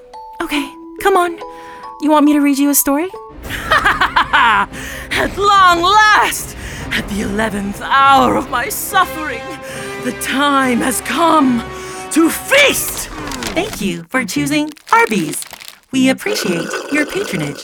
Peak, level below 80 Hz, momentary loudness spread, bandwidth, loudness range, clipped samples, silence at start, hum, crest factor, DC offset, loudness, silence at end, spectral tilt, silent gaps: 0 dBFS; -38 dBFS; 16 LU; over 20 kHz; 4 LU; under 0.1%; 0.15 s; none; 16 dB; under 0.1%; -14 LUFS; 0 s; -3 dB/octave; none